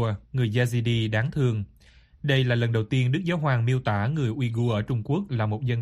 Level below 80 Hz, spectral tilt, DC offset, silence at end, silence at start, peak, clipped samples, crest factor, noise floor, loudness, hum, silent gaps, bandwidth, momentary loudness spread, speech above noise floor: -52 dBFS; -7 dB/octave; under 0.1%; 0 s; 0 s; -8 dBFS; under 0.1%; 16 dB; -54 dBFS; -25 LUFS; none; none; 12 kHz; 4 LU; 30 dB